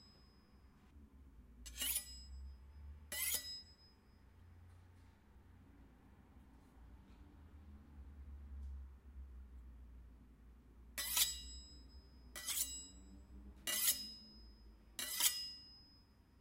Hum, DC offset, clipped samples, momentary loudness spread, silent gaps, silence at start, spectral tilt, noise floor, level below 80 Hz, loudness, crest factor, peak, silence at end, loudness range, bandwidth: none; under 0.1%; under 0.1%; 28 LU; none; 0 s; 0 dB/octave; -67 dBFS; -60 dBFS; -40 LUFS; 32 dB; -16 dBFS; 0 s; 22 LU; 16 kHz